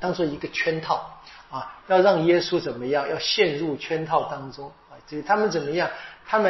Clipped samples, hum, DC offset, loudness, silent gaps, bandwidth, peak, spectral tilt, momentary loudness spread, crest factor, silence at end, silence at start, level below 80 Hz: under 0.1%; none; under 0.1%; -23 LUFS; none; 6.2 kHz; -6 dBFS; -3 dB/octave; 17 LU; 20 dB; 0 s; 0 s; -58 dBFS